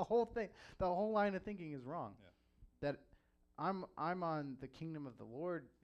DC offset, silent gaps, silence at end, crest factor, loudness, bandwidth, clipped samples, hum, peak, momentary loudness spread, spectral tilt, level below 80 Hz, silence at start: under 0.1%; none; 0.15 s; 18 dB; -43 LUFS; 8.4 kHz; under 0.1%; none; -24 dBFS; 13 LU; -8 dB/octave; -66 dBFS; 0 s